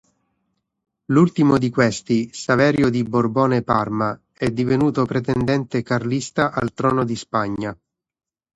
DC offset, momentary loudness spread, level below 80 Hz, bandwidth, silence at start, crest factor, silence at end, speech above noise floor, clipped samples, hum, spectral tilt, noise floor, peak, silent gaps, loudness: under 0.1%; 7 LU; -50 dBFS; 10.5 kHz; 1.1 s; 18 dB; 0.8 s; 54 dB; under 0.1%; none; -6.5 dB/octave; -73 dBFS; -2 dBFS; none; -20 LUFS